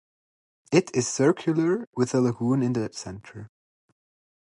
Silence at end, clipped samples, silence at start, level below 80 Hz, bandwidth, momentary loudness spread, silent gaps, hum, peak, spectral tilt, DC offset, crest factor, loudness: 0.95 s; under 0.1%; 0.7 s; -62 dBFS; 11.5 kHz; 16 LU; 1.87-1.92 s; none; -6 dBFS; -6 dB/octave; under 0.1%; 20 dB; -24 LUFS